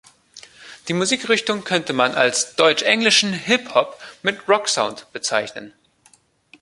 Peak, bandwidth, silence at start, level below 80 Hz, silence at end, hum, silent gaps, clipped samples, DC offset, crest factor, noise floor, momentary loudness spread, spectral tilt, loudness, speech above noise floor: 0 dBFS; 11.5 kHz; 0.35 s; -66 dBFS; 0.95 s; none; none; under 0.1%; under 0.1%; 20 dB; -56 dBFS; 11 LU; -2 dB/octave; -18 LUFS; 37 dB